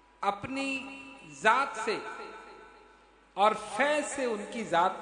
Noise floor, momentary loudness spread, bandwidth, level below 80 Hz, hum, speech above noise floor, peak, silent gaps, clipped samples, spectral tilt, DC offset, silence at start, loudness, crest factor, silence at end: -59 dBFS; 19 LU; 10.5 kHz; -68 dBFS; none; 30 dB; -8 dBFS; none; under 0.1%; -3 dB/octave; under 0.1%; 0.2 s; -30 LUFS; 24 dB; 0 s